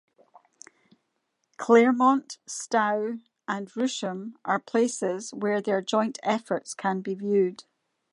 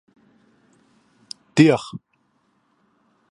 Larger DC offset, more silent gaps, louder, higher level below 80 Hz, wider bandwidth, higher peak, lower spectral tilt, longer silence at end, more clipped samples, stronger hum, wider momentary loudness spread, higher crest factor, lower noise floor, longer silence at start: neither; neither; second, -26 LUFS vs -18 LUFS; second, -82 dBFS vs -68 dBFS; about the same, 11.5 kHz vs 11 kHz; second, -6 dBFS vs 0 dBFS; second, -4.5 dB/octave vs -6.5 dB/octave; second, 0.5 s vs 1.35 s; neither; neither; second, 13 LU vs 24 LU; about the same, 22 dB vs 24 dB; first, -77 dBFS vs -66 dBFS; about the same, 1.6 s vs 1.55 s